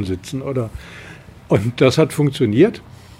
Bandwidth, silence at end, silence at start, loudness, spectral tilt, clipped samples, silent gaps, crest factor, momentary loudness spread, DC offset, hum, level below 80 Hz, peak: 16 kHz; 0.4 s; 0 s; -17 LUFS; -6.5 dB/octave; under 0.1%; none; 18 dB; 21 LU; under 0.1%; none; -46 dBFS; -2 dBFS